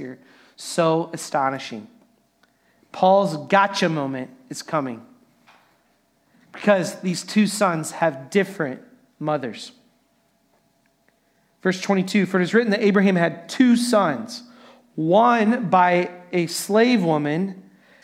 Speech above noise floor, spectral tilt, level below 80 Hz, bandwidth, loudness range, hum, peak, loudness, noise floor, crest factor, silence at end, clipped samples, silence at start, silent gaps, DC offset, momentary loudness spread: 44 dB; -5.5 dB/octave; -74 dBFS; 16 kHz; 8 LU; none; -2 dBFS; -21 LUFS; -64 dBFS; 20 dB; 0.45 s; under 0.1%; 0 s; none; under 0.1%; 17 LU